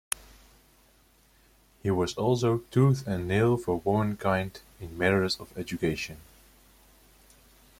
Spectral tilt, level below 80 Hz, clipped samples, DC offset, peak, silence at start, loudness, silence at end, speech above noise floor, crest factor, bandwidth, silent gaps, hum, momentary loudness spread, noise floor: -6 dB/octave; -54 dBFS; under 0.1%; under 0.1%; -4 dBFS; 1.85 s; -28 LUFS; 1.65 s; 35 dB; 24 dB; 16.5 kHz; none; none; 13 LU; -62 dBFS